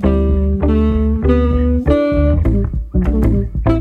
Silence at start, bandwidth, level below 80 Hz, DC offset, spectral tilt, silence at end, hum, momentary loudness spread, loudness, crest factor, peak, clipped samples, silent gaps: 0 s; 4.3 kHz; -16 dBFS; under 0.1%; -10.5 dB/octave; 0 s; none; 3 LU; -15 LUFS; 12 dB; -2 dBFS; under 0.1%; none